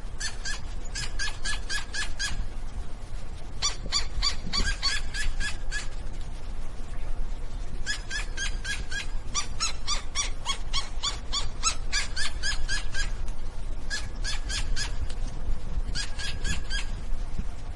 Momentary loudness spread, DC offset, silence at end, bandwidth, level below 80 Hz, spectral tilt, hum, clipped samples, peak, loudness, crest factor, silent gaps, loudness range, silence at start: 12 LU; under 0.1%; 0 s; 11.5 kHz; -30 dBFS; -1.5 dB/octave; none; under 0.1%; -10 dBFS; -32 LUFS; 16 dB; none; 5 LU; 0 s